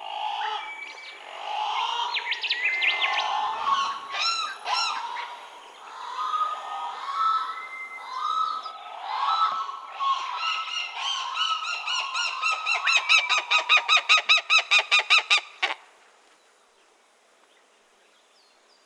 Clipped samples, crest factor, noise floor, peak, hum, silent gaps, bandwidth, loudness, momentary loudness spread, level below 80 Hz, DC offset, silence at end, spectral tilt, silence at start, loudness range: under 0.1%; 22 dB; -61 dBFS; -6 dBFS; none; none; 11.5 kHz; -23 LUFS; 18 LU; -84 dBFS; under 0.1%; 3.05 s; 3.5 dB/octave; 0 s; 10 LU